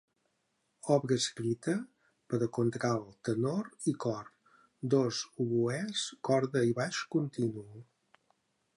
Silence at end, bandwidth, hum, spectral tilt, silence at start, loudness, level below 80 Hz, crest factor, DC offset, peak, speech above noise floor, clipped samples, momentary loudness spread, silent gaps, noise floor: 0.95 s; 11.5 kHz; none; -5.5 dB/octave; 0.85 s; -33 LUFS; -74 dBFS; 20 dB; under 0.1%; -14 dBFS; 47 dB; under 0.1%; 8 LU; none; -79 dBFS